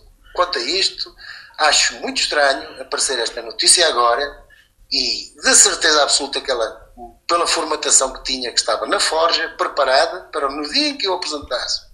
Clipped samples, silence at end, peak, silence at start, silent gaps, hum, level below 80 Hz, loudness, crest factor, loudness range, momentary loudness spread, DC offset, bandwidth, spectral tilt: under 0.1%; 0.15 s; 0 dBFS; 0.35 s; none; none; -48 dBFS; -16 LUFS; 18 dB; 4 LU; 12 LU; under 0.1%; 15.5 kHz; 1 dB/octave